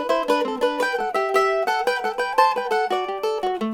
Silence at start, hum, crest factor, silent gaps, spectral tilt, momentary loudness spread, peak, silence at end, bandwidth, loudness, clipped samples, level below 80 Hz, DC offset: 0 s; none; 20 dB; none; -3 dB/octave; 5 LU; -2 dBFS; 0 s; 17.5 kHz; -22 LUFS; under 0.1%; -58 dBFS; under 0.1%